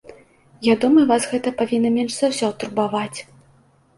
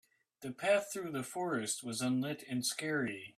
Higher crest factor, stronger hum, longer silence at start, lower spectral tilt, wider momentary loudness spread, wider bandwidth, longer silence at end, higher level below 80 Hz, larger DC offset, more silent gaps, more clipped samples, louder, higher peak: about the same, 16 dB vs 18 dB; neither; second, 0.1 s vs 0.4 s; about the same, -4.5 dB/octave vs -3.5 dB/octave; about the same, 9 LU vs 8 LU; second, 11.5 kHz vs 15.5 kHz; first, 0.75 s vs 0.05 s; first, -62 dBFS vs -78 dBFS; neither; neither; neither; first, -20 LUFS vs -36 LUFS; first, -4 dBFS vs -18 dBFS